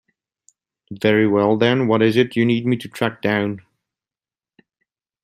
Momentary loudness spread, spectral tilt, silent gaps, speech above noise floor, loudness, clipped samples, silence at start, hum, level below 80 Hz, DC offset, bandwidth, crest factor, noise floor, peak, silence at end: 8 LU; -7 dB/octave; none; over 72 dB; -18 LUFS; under 0.1%; 0.9 s; none; -60 dBFS; under 0.1%; 13 kHz; 18 dB; under -90 dBFS; -2 dBFS; 1.65 s